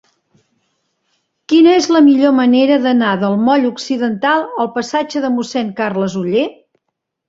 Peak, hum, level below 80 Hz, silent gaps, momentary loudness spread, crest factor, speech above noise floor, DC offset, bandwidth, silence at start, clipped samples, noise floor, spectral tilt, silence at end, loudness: -2 dBFS; none; -60 dBFS; none; 9 LU; 12 dB; 62 dB; under 0.1%; 7.8 kHz; 1.5 s; under 0.1%; -75 dBFS; -5.5 dB/octave; 0.75 s; -14 LUFS